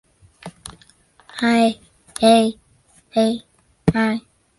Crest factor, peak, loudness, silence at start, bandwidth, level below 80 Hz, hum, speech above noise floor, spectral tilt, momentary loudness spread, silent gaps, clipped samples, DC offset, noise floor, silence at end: 18 dB; -2 dBFS; -19 LUFS; 0.45 s; 11.5 kHz; -48 dBFS; none; 39 dB; -5.5 dB/octave; 24 LU; none; under 0.1%; under 0.1%; -56 dBFS; 0.4 s